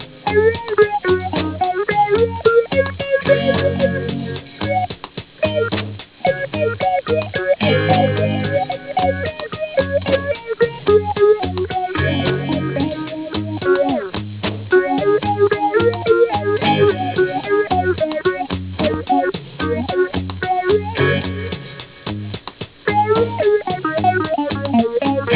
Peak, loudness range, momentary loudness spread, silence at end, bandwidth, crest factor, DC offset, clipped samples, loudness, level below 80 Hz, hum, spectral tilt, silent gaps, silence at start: 0 dBFS; 4 LU; 10 LU; 0 s; 4 kHz; 18 dB; under 0.1%; under 0.1%; -18 LUFS; -38 dBFS; none; -10.5 dB/octave; none; 0 s